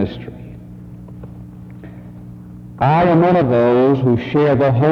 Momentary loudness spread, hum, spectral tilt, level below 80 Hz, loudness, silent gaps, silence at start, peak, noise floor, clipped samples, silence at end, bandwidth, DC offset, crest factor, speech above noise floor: 23 LU; 60 Hz at -35 dBFS; -10 dB/octave; -44 dBFS; -14 LUFS; none; 0 s; -2 dBFS; -35 dBFS; under 0.1%; 0 s; 6.2 kHz; under 0.1%; 14 dB; 22 dB